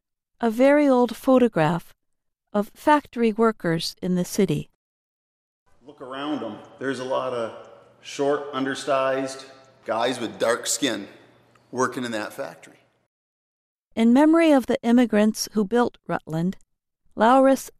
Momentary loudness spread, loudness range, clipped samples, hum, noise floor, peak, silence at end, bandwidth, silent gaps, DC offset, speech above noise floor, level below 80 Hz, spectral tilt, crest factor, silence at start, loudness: 16 LU; 9 LU; under 0.1%; none; -74 dBFS; -6 dBFS; 0.1 s; 15 kHz; 4.75-5.66 s, 13.06-13.91 s; under 0.1%; 53 dB; -60 dBFS; -5 dB/octave; 18 dB; 0.4 s; -22 LUFS